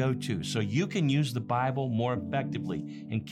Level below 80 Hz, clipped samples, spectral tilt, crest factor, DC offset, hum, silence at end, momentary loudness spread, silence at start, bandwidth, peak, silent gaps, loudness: -66 dBFS; under 0.1%; -6.5 dB/octave; 14 dB; under 0.1%; none; 0 s; 8 LU; 0 s; 13.5 kHz; -16 dBFS; none; -30 LUFS